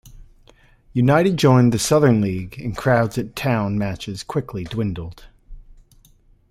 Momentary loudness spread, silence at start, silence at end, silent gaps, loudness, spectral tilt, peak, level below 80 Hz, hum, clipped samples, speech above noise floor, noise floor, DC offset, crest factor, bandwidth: 13 LU; 0.05 s; 0.8 s; none; -19 LUFS; -6 dB/octave; -2 dBFS; -44 dBFS; none; under 0.1%; 35 dB; -54 dBFS; under 0.1%; 18 dB; 15 kHz